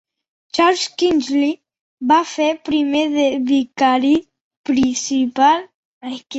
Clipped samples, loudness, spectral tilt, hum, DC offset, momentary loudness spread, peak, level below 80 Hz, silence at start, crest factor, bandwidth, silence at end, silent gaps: under 0.1%; -17 LUFS; -3 dB/octave; none; under 0.1%; 11 LU; -2 dBFS; -56 dBFS; 0.55 s; 16 dB; 8.2 kHz; 0 s; 1.81-1.97 s, 4.41-4.51 s, 4.57-4.64 s, 5.74-6.01 s